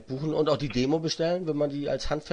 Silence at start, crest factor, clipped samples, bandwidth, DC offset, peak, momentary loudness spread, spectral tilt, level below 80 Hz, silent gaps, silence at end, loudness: 0 s; 16 dB; under 0.1%; 10 kHz; under 0.1%; -12 dBFS; 4 LU; -6 dB/octave; -46 dBFS; none; 0 s; -28 LUFS